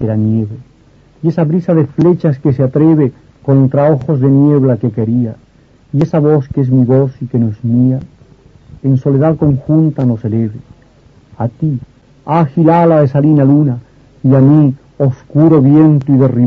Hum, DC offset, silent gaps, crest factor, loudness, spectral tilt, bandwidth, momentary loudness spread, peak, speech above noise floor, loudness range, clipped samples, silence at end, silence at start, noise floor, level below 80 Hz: none; under 0.1%; none; 10 dB; -11 LUFS; -11.5 dB/octave; 4.4 kHz; 10 LU; 0 dBFS; 34 dB; 5 LU; under 0.1%; 0 s; 0 s; -44 dBFS; -44 dBFS